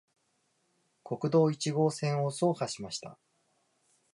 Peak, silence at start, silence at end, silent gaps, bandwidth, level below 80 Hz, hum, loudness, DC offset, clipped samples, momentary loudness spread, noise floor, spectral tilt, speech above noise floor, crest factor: -14 dBFS; 1.05 s; 1 s; none; 11.5 kHz; -76 dBFS; none; -31 LUFS; under 0.1%; under 0.1%; 14 LU; -75 dBFS; -6 dB/octave; 45 dB; 18 dB